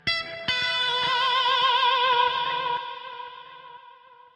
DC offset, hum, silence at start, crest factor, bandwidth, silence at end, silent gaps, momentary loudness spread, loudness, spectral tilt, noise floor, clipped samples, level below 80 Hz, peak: under 0.1%; none; 0.05 s; 14 dB; 9.8 kHz; 0.45 s; none; 18 LU; -22 LUFS; -1.5 dB/octave; -51 dBFS; under 0.1%; -64 dBFS; -10 dBFS